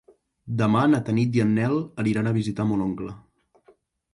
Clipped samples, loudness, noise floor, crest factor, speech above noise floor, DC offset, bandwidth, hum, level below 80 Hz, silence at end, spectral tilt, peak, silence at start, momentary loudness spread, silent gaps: under 0.1%; -23 LUFS; -60 dBFS; 14 dB; 37 dB; under 0.1%; 11 kHz; none; -56 dBFS; 0.95 s; -8 dB/octave; -10 dBFS; 0.45 s; 9 LU; none